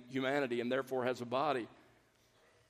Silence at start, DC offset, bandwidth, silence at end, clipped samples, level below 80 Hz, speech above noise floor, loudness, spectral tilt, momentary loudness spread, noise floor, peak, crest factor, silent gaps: 0 s; under 0.1%; 15 kHz; 0.95 s; under 0.1%; -82 dBFS; 34 dB; -36 LUFS; -5.5 dB/octave; 4 LU; -70 dBFS; -20 dBFS; 18 dB; none